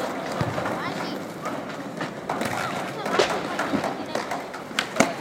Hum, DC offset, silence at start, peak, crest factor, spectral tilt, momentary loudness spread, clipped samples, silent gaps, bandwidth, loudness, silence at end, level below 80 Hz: none; under 0.1%; 0 s; -2 dBFS; 24 dB; -4 dB/octave; 9 LU; under 0.1%; none; 17 kHz; -27 LUFS; 0 s; -58 dBFS